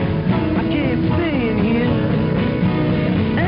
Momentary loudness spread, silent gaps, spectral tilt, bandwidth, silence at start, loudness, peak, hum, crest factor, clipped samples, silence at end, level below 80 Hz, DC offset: 1 LU; none; -6.5 dB/octave; 5.2 kHz; 0 s; -18 LUFS; -4 dBFS; none; 12 dB; under 0.1%; 0 s; -34 dBFS; under 0.1%